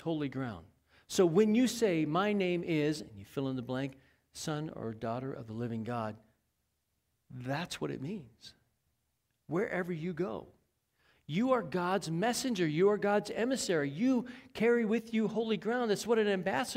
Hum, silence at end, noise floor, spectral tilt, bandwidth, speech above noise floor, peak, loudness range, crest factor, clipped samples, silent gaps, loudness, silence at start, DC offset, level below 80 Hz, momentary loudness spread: none; 0 s; -81 dBFS; -5.5 dB/octave; 16 kHz; 48 dB; -16 dBFS; 10 LU; 18 dB; under 0.1%; none; -33 LUFS; 0 s; under 0.1%; -68 dBFS; 13 LU